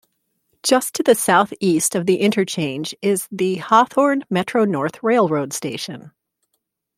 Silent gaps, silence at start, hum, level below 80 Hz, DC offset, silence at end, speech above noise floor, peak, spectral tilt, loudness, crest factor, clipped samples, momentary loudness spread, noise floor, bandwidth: none; 0.65 s; none; -66 dBFS; under 0.1%; 0.9 s; 56 dB; -2 dBFS; -4 dB/octave; -18 LUFS; 18 dB; under 0.1%; 10 LU; -74 dBFS; 16.5 kHz